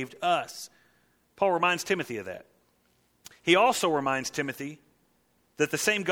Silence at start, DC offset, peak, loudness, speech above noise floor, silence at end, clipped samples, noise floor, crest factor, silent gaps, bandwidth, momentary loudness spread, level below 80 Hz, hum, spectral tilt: 0 s; under 0.1%; -6 dBFS; -27 LUFS; 42 dB; 0 s; under 0.1%; -69 dBFS; 22 dB; none; 18.5 kHz; 18 LU; -70 dBFS; none; -3 dB/octave